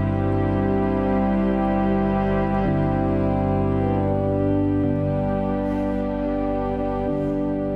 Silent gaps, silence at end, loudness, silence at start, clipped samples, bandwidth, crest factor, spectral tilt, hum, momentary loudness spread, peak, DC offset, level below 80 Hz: none; 0 s; -22 LUFS; 0 s; under 0.1%; 5.4 kHz; 12 dB; -10.5 dB/octave; 50 Hz at -40 dBFS; 3 LU; -8 dBFS; under 0.1%; -34 dBFS